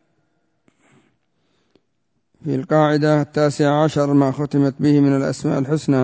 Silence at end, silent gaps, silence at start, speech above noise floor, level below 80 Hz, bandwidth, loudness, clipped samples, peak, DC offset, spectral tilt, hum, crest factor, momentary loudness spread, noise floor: 0 s; none; 2.45 s; 55 dB; -58 dBFS; 8 kHz; -18 LUFS; under 0.1%; -4 dBFS; under 0.1%; -7.5 dB/octave; none; 16 dB; 6 LU; -72 dBFS